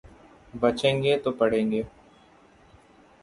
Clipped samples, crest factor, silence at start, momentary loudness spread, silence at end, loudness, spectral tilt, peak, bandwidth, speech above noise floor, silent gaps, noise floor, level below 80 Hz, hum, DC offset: under 0.1%; 20 dB; 0.55 s; 12 LU; 1.35 s; -25 LUFS; -6 dB/octave; -8 dBFS; 11.5 kHz; 32 dB; none; -56 dBFS; -56 dBFS; none; under 0.1%